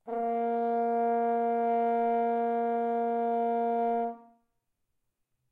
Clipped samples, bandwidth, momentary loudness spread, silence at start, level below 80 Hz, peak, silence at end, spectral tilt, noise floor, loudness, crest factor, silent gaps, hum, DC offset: under 0.1%; 4 kHz; 3 LU; 0.05 s; -82 dBFS; -20 dBFS; 1.3 s; -8.5 dB/octave; -80 dBFS; -29 LUFS; 10 dB; none; none; under 0.1%